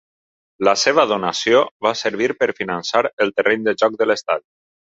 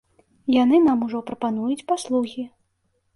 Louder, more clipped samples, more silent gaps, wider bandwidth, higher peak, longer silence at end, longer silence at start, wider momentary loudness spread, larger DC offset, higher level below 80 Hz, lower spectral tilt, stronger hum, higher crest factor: first, -18 LUFS vs -22 LUFS; neither; first, 1.71-1.80 s, 3.13-3.17 s vs none; second, 7.8 kHz vs 11.5 kHz; first, 0 dBFS vs -8 dBFS; second, 0.55 s vs 0.7 s; first, 0.6 s vs 0.45 s; second, 6 LU vs 15 LU; neither; about the same, -62 dBFS vs -62 dBFS; second, -3 dB/octave vs -5.5 dB/octave; neither; about the same, 18 dB vs 14 dB